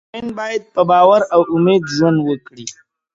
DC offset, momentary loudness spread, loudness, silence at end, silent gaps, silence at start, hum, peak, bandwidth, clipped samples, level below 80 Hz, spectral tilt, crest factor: under 0.1%; 18 LU; -14 LUFS; 0.4 s; none; 0.15 s; none; 0 dBFS; 7.8 kHz; under 0.1%; -56 dBFS; -6 dB/octave; 14 dB